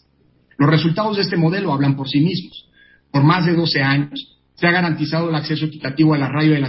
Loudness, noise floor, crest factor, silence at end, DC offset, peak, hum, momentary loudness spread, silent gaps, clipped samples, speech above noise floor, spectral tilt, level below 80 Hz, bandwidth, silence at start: -18 LUFS; -58 dBFS; 14 dB; 0 s; under 0.1%; -2 dBFS; none; 8 LU; none; under 0.1%; 41 dB; -10.5 dB/octave; -56 dBFS; 5.8 kHz; 0.6 s